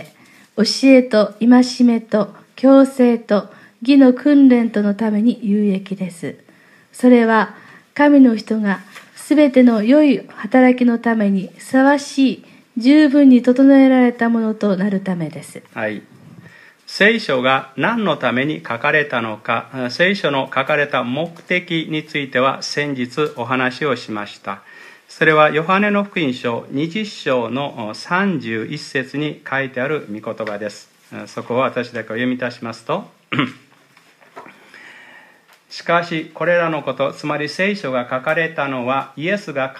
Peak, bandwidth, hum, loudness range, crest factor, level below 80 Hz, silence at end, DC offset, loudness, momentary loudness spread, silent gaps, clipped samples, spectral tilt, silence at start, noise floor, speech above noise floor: 0 dBFS; 12 kHz; none; 10 LU; 16 dB; -70 dBFS; 0 s; under 0.1%; -16 LUFS; 14 LU; none; under 0.1%; -6 dB/octave; 0 s; -51 dBFS; 35 dB